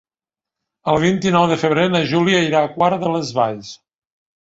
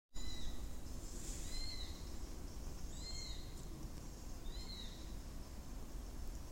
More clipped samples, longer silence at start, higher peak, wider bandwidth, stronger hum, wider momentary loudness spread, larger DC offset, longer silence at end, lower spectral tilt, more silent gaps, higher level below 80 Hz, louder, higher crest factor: neither; first, 0.85 s vs 0.1 s; first, -2 dBFS vs -30 dBFS; second, 8 kHz vs 16 kHz; neither; about the same, 6 LU vs 6 LU; neither; first, 0.65 s vs 0 s; first, -5.5 dB/octave vs -3.5 dB/octave; neither; second, -54 dBFS vs -48 dBFS; first, -17 LUFS vs -50 LUFS; about the same, 16 dB vs 14 dB